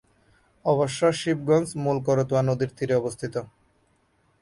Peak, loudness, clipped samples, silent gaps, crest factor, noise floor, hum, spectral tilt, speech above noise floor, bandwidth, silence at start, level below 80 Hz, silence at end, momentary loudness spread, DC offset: -10 dBFS; -25 LUFS; under 0.1%; none; 16 dB; -66 dBFS; none; -6 dB/octave; 42 dB; 11.5 kHz; 0.65 s; -60 dBFS; 0.95 s; 8 LU; under 0.1%